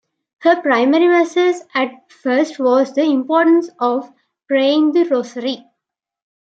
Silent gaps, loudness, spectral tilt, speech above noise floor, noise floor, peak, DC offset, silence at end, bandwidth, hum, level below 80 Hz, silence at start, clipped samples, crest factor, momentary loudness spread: none; -16 LUFS; -4 dB/octave; 66 dB; -81 dBFS; -2 dBFS; under 0.1%; 0.95 s; 7.8 kHz; none; -76 dBFS; 0.4 s; under 0.1%; 14 dB; 11 LU